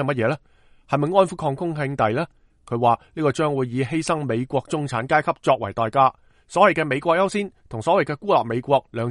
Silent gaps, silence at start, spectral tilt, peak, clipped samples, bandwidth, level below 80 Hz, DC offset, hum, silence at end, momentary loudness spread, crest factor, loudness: none; 0 s; -6 dB/octave; -2 dBFS; under 0.1%; 11.5 kHz; -56 dBFS; under 0.1%; none; 0 s; 8 LU; 20 dB; -22 LUFS